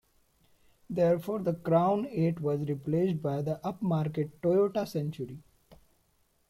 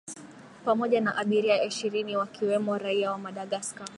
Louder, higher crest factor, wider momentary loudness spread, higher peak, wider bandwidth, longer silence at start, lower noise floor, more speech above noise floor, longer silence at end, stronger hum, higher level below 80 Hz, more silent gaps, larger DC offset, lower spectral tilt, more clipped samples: about the same, -30 LUFS vs -28 LUFS; about the same, 18 dB vs 18 dB; about the same, 9 LU vs 10 LU; second, -14 dBFS vs -10 dBFS; first, 15 kHz vs 11.5 kHz; first, 0.9 s vs 0.05 s; first, -70 dBFS vs -48 dBFS; first, 41 dB vs 20 dB; first, 0.75 s vs 0 s; neither; first, -66 dBFS vs -78 dBFS; neither; neither; first, -9 dB/octave vs -4 dB/octave; neither